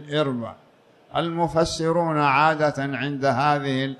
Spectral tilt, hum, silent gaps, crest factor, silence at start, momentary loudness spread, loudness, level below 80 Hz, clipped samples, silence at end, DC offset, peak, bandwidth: -5.5 dB/octave; none; none; 16 dB; 0 s; 9 LU; -22 LUFS; -52 dBFS; under 0.1%; 0 s; under 0.1%; -6 dBFS; 12 kHz